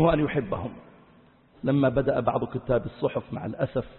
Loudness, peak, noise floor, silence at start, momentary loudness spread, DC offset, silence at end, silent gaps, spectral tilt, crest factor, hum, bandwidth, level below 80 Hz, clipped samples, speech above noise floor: -27 LUFS; -8 dBFS; -57 dBFS; 0 s; 10 LU; under 0.1%; 0 s; none; -12 dB/octave; 18 dB; none; 4.3 kHz; -48 dBFS; under 0.1%; 31 dB